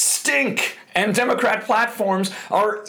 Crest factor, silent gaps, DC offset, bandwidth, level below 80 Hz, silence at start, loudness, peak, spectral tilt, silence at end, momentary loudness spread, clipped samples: 14 dB; none; under 0.1%; over 20 kHz; -68 dBFS; 0 s; -20 LUFS; -6 dBFS; -2.5 dB/octave; 0 s; 5 LU; under 0.1%